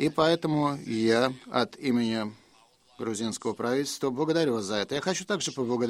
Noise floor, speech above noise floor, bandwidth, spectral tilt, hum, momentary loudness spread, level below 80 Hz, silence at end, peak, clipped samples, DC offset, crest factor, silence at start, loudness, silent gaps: -61 dBFS; 33 dB; 15.5 kHz; -4.5 dB/octave; none; 7 LU; -66 dBFS; 0 s; -8 dBFS; under 0.1%; under 0.1%; 20 dB; 0 s; -28 LUFS; none